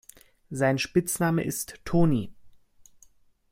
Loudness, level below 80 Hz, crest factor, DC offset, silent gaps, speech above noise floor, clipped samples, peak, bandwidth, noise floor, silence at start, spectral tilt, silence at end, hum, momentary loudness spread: -26 LUFS; -50 dBFS; 18 dB; under 0.1%; none; 34 dB; under 0.1%; -10 dBFS; 16.5 kHz; -59 dBFS; 0.5 s; -5.5 dB/octave; 1.05 s; none; 10 LU